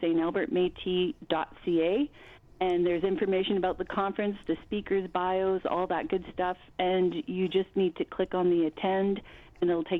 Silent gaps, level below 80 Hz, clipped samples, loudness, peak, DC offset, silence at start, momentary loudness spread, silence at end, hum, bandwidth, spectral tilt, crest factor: none; -58 dBFS; under 0.1%; -29 LUFS; -12 dBFS; under 0.1%; 0 s; 6 LU; 0 s; none; 4.1 kHz; -8.5 dB/octave; 16 dB